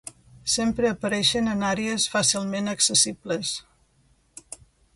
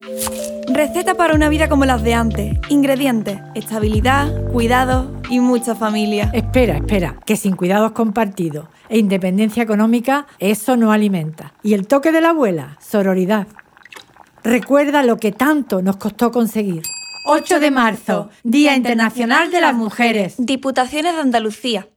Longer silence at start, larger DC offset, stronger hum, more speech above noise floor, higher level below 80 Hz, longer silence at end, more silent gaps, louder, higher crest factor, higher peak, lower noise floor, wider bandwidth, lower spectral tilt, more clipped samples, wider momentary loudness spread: about the same, 0.05 s vs 0 s; neither; neither; first, 39 dB vs 26 dB; second, -54 dBFS vs -32 dBFS; first, 0.4 s vs 0.15 s; neither; second, -23 LUFS vs -16 LUFS; first, 20 dB vs 14 dB; second, -6 dBFS vs -2 dBFS; first, -63 dBFS vs -42 dBFS; second, 12 kHz vs 20 kHz; second, -2.5 dB/octave vs -5.5 dB/octave; neither; first, 22 LU vs 8 LU